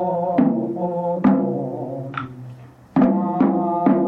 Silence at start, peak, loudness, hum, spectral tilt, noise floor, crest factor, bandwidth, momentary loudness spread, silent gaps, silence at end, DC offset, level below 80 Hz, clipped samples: 0 s; -4 dBFS; -20 LUFS; none; -10.5 dB/octave; -40 dBFS; 16 dB; 4.3 kHz; 12 LU; none; 0 s; under 0.1%; -56 dBFS; under 0.1%